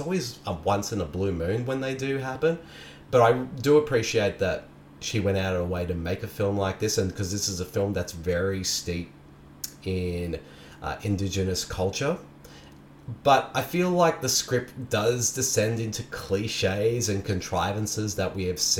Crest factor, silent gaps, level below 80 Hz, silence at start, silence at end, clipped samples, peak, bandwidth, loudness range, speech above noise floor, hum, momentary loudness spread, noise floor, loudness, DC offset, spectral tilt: 20 dB; none; -50 dBFS; 0 s; 0 s; under 0.1%; -6 dBFS; 18 kHz; 6 LU; 23 dB; none; 12 LU; -49 dBFS; -26 LUFS; under 0.1%; -4 dB/octave